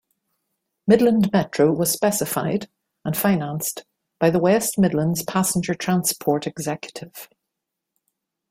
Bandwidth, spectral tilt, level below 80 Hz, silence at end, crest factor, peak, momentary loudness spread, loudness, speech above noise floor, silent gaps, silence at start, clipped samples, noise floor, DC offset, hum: 16.5 kHz; -5 dB/octave; -58 dBFS; 1.25 s; 20 dB; -2 dBFS; 15 LU; -21 LUFS; 62 dB; none; 0.85 s; under 0.1%; -82 dBFS; under 0.1%; none